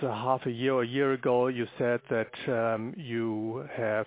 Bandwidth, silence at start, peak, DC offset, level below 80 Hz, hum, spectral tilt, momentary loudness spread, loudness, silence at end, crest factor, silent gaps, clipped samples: 4 kHz; 0 s; -14 dBFS; under 0.1%; -72 dBFS; none; -10.5 dB/octave; 7 LU; -30 LUFS; 0 s; 16 dB; none; under 0.1%